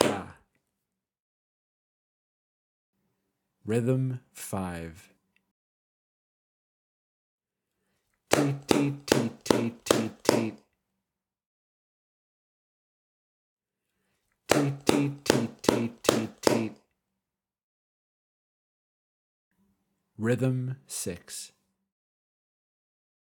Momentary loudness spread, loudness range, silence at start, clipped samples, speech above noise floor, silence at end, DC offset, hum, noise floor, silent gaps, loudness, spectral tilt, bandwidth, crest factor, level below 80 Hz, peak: 13 LU; 9 LU; 0 s; under 0.1%; 60 dB; 1.85 s; under 0.1%; none; -88 dBFS; 1.20-2.93 s, 5.51-7.38 s, 11.46-13.57 s, 17.63-19.51 s; -28 LUFS; -5 dB/octave; 19 kHz; 30 dB; -66 dBFS; -4 dBFS